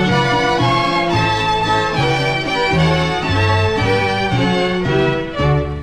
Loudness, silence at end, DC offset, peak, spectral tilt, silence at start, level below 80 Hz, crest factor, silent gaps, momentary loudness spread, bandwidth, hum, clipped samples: -16 LUFS; 0 s; 0.9%; -4 dBFS; -5.5 dB/octave; 0 s; -32 dBFS; 12 dB; none; 2 LU; 14 kHz; none; under 0.1%